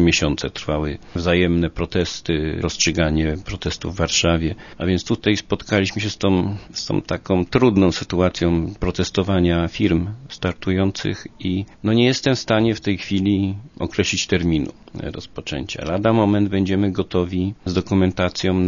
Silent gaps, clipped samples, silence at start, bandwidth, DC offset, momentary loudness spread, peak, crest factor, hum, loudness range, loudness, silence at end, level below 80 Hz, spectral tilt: none; under 0.1%; 0 s; 7.4 kHz; under 0.1%; 9 LU; -2 dBFS; 18 dB; none; 2 LU; -20 LUFS; 0 s; -38 dBFS; -5.5 dB/octave